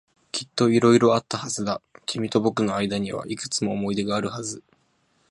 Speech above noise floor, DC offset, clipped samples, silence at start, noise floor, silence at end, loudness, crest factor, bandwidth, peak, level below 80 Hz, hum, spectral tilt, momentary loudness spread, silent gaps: 43 dB; under 0.1%; under 0.1%; 0.35 s; -66 dBFS; 0.7 s; -24 LUFS; 20 dB; 11.5 kHz; -4 dBFS; -60 dBFS; none; -5 dB/octave; 14 LU; none